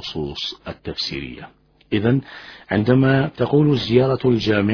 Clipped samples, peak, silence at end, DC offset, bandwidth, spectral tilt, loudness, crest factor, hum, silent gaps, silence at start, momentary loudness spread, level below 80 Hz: under 0.1%; -2 dBFS; 0 s; under 0.1%; 5.4 kHz; -7.5 dB/octave; -19 LUFS; 18 dB; none; none; 0 s; 16 LU; -46 dBFS